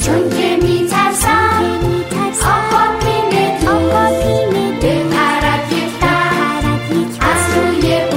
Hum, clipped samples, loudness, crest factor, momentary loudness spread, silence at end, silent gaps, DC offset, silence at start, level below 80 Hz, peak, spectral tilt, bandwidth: none; under 0.1%; -14 LUFS; 12 dB; 4 LU; 0 s; none; under 0.1%; 0 s; -30 dBFS; -2 dBFS; -4.5 dB/octave; 16.5 kHz